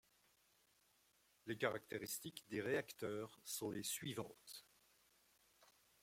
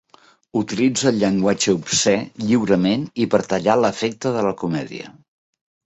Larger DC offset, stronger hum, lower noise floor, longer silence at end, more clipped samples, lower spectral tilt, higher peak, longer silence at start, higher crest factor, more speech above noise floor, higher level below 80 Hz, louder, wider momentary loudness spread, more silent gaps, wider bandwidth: neither; neither; first, -77 dBFS vs -53 dBFS; second, 0.4 s vs 0.75 s; neither; about the same, -3.5 dB/octave vs -4.5 dB/octave; second, -24 dBFS vs -2 dBFS; first, 1.45 s vs 0.55 s; first, 24 dB vs 18 dB; about the same, 31 dB vs 34 dB; second, -84 dBFS vs -56 dBFS; second, -46 LUFS vs -19 LUFS; first, 13 LU vs 8 LU; neither; first, 16.5 kHz vs 8.4 kHz